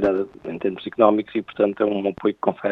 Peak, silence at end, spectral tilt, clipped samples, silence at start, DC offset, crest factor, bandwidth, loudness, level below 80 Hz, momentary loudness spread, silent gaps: 0 dBFS; 0 s; -8.5 dB/octave; under 0.1%; 0 s; under 0.1%; 22 dB; 5.6 kHz; -22 LUFS; -56 dBFS; 9 LU; none